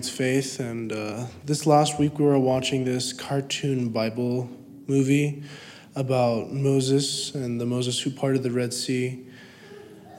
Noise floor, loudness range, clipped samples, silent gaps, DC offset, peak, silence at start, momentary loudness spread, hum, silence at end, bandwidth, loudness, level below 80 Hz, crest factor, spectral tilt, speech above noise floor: -45 dBFS; 3 LU; under 0.1%; none; under 0.1%; -6 dBFS; 0 s; 17 LU; none; 0 s; 16 kHz; -25 LUFS; -64 dBFS; 18 dB; -5 dB/octave; 21 dB